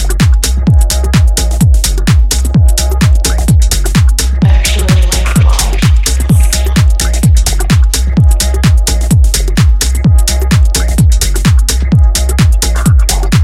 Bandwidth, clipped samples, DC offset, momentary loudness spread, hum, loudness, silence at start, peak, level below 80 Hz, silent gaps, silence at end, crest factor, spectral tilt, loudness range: 16 kHz; under 0.1%; under 0.1%; 1 LU; none; -10 LUFS; 0 s; 0 dBFS; -10 dBFS; none; 0 s; 8 dB; -4.5 dB/octave; 0 LU